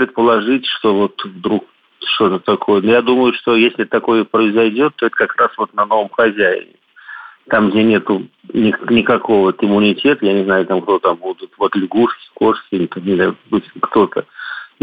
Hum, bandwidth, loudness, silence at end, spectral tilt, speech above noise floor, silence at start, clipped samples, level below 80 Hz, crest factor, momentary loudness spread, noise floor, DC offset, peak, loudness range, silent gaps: none; 5 kHz; -15 LUFS; 0.15 s; -8.5 dB/octave; 21 dB; 0 s; under 0.1%; -56 dBFS; 12 dB; 9 LU; -35 dBFS; under 0.1%; -2 dBFS; 3 LU; none